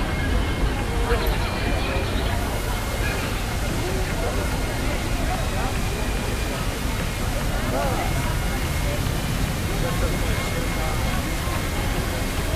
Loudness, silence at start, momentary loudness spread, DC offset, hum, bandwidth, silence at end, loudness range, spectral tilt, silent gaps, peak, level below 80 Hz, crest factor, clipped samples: -25 LUFS; 0 s; 2 LU; under 0.1%; none; 16 kHz; 0 s; 1 LU; -4.5 dB/octave; none; -8 dBFS; -26 dBFS; 16 dB; under 0.1%